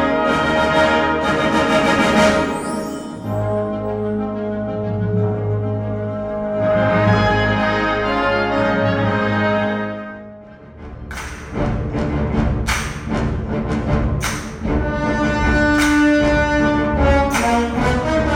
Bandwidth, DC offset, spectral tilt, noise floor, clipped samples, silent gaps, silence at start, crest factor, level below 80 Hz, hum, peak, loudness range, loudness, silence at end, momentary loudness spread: 16.5 kHz; under 0.1%; -6 dB/octave; -38 dBFS; under 0.1%; none; 0 s; 16 dB; -28 dBFS; none; -2 dBFS; 6 LU; -18 LUFS; 0 s; 10 LU